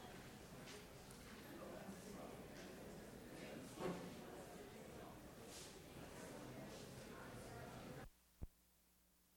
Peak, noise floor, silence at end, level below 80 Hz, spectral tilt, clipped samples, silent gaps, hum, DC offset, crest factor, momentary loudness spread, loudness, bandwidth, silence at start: -34 dBFS; -76 dBFS; 0 s; -68 dBFS; -4.5 dB/octave; under 0.1%; none; none; under 0.1%; 22 dB; 5 LU; -56 LUFS; over 20 kHz; 0 s